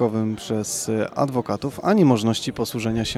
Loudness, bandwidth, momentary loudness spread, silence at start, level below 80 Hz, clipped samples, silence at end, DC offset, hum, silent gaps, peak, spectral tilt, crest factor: -22 LUFS; 15 kHz; 8 LU; 0 s; -50 dBFS; under 0.1%; 0 s; under 0.1%; none; none; -4 dBFS; -5.5 dB/octave; 18 dB